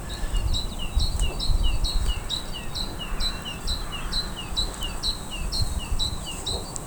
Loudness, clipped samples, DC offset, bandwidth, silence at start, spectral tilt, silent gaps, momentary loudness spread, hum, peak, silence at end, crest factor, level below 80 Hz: -29 LUFS; under 0.1%; under 0.1%; over 20 kHz; 0 s; -3 dB/octave; none; 4 LU; none; -8 dBFS; 0 s; 18 dB; -28 dBFS